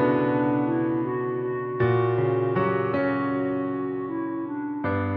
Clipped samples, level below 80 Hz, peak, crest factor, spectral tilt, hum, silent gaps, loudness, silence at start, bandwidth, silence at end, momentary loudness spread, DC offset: under 0.1%; -60 dBFS; -12 dBFS; 14 dB; -11 dB/octave; none; none; -25 LUFS; 0 s; 4.9 kHz; 0 s; 7 LU; under 0.1%